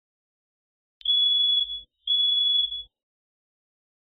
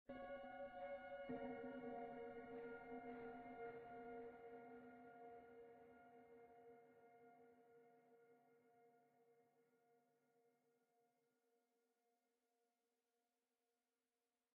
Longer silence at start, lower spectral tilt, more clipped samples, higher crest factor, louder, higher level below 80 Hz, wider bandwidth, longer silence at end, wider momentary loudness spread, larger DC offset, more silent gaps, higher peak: first, 1.05 s vs 0.1 s; second, 3.5 dB/octave vs -4.5 dB/octave; neither; second, 12 dB vs 20 dB; first, -21 LUFS vs -56 LUFS; first, -62 dBFS vs -84 dBFS; about the same, 4.4 kHz vs 4.5 kHz; second, 1.2 s vs 4.05 s; about the same, 12 LU vs 14 LU; neither; neither; first, -16 dBFS vs -40 dBFS